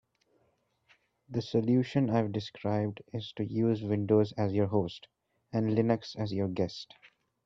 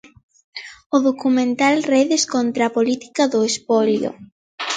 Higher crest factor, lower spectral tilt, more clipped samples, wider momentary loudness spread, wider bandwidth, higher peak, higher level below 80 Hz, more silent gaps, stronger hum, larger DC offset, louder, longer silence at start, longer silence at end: about the same, 18 dB vs 16 dB; first, -8 dB/octave vs -3.5 dB/octave; neither; about the same, 11 LU vs 13 LU; second, 7.4 kHz vs 9.4 kHz; second, -12 dBFS vs -4 dBFS; about the same, -68 dBFS vs -66 dBFS; second, none vs 0.86-0.90 s, 4.32-4.58 s; neither; neither; second, -31 LUFS vs -18 LUFS; first, 1.3 s vs 0.55 s; first, 0.6 s vs 0 s